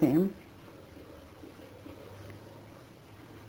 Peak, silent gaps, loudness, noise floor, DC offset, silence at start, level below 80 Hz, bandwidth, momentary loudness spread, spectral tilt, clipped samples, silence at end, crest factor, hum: -12 dBFS; none; -34 LUFS; -52 dBFS; under 0.1%; 0 s; -62 dBFS; over 20 kHz; 20 LU; -8.5 dB/octave; under 0.1%; 0.1 s; 22 dB; none